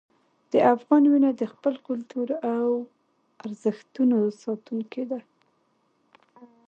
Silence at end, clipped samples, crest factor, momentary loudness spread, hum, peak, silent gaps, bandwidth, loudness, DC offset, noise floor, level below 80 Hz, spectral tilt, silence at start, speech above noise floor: 0.2 s; under 0.1%; 20 dB; 14 LU; none; -6 dBFS; none; 8 kHz; -25 LUFS; under 0.1%; -69 dBFS; -80 dBFS; -7.5 dB/octave; 0.55 s; 45 dB